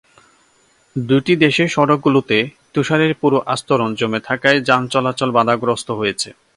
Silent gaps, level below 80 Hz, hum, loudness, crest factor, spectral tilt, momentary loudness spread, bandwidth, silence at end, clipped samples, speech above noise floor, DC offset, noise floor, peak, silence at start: none; -56 dBFS; none; -16 LUFS; 16 dB; -5 dB/octave; 7 LU; 11.5 kHz; 0.25 s; under 0.1%; 40 dB; under 0.1%; -56 dBFS; 0 dBFS; 0.95 s